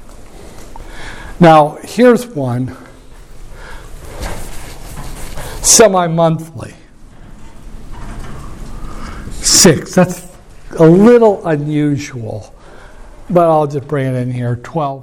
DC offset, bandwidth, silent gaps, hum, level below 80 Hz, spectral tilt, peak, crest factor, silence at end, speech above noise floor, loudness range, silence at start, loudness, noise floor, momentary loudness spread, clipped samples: under 0.1%; 17 kHz; none; none; -32 dBFS; -4.5 dB/octave; 0 dBFS; 14 dB; 0 s; 25 dB; 11 LU; 0 s; -11 LUFS; -36 dBFS; 25 LU; under 0.1%